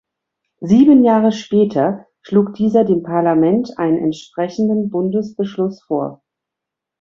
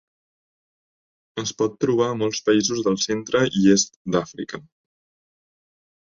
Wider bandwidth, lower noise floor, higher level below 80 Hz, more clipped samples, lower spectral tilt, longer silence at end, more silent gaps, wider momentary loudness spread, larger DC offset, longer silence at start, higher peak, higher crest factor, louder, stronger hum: about the same, 7.4 kHz vs 7.6 kHz; second, -83 dBFS vs under -90 dBFS; about the same, -56 dBFS vs -60 dBFS; neither; first, -8 dB/octave vs -4 dB/octave; second, 0.85 s vs 1.5 s; second, none vs 3.96-4.05 s; second, 12 LU vs 15 LU; neither; second, 0.6 s vs 1.35 s; about the same, -2 dBFS vs -4 dBFS; second, 14 dB vs 20 dB; first, -16 LUFS vs -21 LUFS; neither